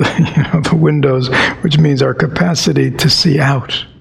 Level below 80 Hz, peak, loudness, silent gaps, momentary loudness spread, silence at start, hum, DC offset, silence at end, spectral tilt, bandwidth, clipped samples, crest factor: -40 dBFS; 0 dBFS; -12 LUFS; none; 4 LU; 0 s; none; under 0.1%; 0.15 s; -5.5 dB/octave; 14.5 kHz; under 0.1%; 12 dB